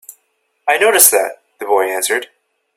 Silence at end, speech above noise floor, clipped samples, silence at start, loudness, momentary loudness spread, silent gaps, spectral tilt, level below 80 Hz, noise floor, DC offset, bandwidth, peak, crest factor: 0.5 s; 52 dB; 0.1%; 0.1 s; -13 LUFS; 15 LU; none; 1 dB/octave; -66 dBFS; -65 dBFS; under 0.1%; 16 kHz; 0 dBFS; 16 dB